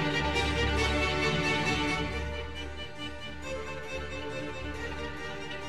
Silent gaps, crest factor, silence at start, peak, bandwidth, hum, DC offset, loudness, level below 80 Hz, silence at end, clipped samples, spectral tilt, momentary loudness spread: none; 16 dB; 0 s; -16 dBFS; 13 kHz; none; 0.6%; -31 LUFS; -40 dBFS; 0 s; under 0.1%; -4.5 dB/octave; 12 LU